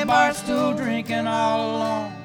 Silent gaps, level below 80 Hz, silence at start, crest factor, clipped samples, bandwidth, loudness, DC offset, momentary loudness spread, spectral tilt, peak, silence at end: none; -56 dBFS; 0 s; 18 dB; under 0.1%; 20 kHz; -22 LUFS; under 0.1%; 6 LU; -4.5 dB/octave; -4 dBFS; 0 s